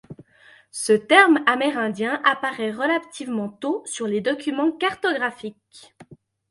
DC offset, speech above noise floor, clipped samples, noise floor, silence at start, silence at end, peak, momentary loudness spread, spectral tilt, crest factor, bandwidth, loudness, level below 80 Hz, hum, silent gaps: under 0.1%; 31 dB; under 0.1%; -53 dBFS; 0.1 s; 0.35 s; 0 dBFS; 14 LU; -3.5 dB/octave; 22 dB; 12 kHz; -21 LUFS; -70 dBFS; none; none